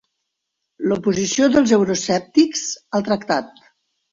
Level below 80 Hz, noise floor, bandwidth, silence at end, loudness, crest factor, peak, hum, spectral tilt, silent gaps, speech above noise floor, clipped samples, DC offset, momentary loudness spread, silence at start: -56 dBFS; -78 dBFS; 7.8 kHz; 0.65 s; -19 LUFS; 18 dB; -2 dBFS; none; -4 dB/octave; none; 60 dB; under 0.1%; under 0.1%; 8 LU; 0.8 s